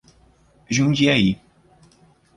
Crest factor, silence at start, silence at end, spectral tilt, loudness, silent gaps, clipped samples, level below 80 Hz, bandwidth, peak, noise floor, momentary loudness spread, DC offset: 18 dB; 0.7 s; 1 s; -5 dB/octave; -19 LUFS; none; under 0.1%; -50 dBFS; 11 kHz; -4 dBFS; -56 dBFS; 9 LU; under 0.1%